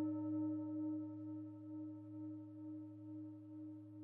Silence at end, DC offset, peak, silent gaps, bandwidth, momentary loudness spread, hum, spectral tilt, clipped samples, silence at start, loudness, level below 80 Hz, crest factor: 0 s; under 0.1%; -34 dBFS; none; 1.9 kHz; 11 LU; none; -12.5 dB/octave; under 0.1%; 0 s; -48 LUFS; under -90 dBFS; 14 dB